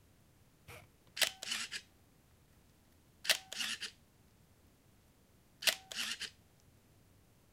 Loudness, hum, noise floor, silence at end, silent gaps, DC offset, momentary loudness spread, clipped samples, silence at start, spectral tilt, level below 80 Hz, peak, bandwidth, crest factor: -37 LUFS; none; -67 dBFS; 1.2 s; none; under 0.1%; 20 LU; under 0.1%; 0.7 s; 1 dB/octave; -74 dBFS; -12 dBFS; 16 kHz; 30 dB